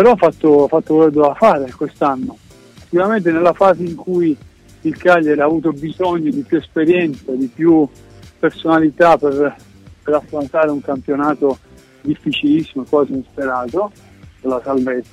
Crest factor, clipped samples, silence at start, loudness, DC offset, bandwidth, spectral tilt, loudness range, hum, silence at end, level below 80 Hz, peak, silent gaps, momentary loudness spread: 14 dB; under 0.1%; 0 s; -16 LUFS; under 0.1%; 9.8 kHz; -7.5 dB/octave; 4 LU; none; 0.1 s; -50 dBFS; -2 dBFS; none; 10 LU